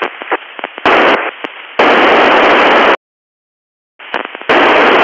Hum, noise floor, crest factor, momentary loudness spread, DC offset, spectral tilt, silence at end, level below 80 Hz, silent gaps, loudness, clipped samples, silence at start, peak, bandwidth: none; under -90 dBFS; 10 dB; 14 LU; under 0.1%; -4 dB/octave; 0 s; -48 dBFS; 2.97-3.99 s; -9 LUFS; under 0.1%; 0 s; 0 dBFS; 7.8 kHz